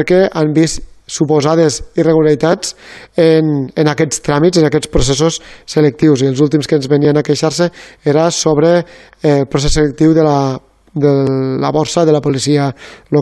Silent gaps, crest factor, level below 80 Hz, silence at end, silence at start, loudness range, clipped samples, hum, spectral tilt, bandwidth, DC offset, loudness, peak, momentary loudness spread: none; 12 dB; -32 dBFS; 0 s; 0 s; 1 LU; under 0.1%; none; -5.5 dB/octave; 12.5 kHz; under 0.1%; -13 LUFS; 0 dBFS; 8 LU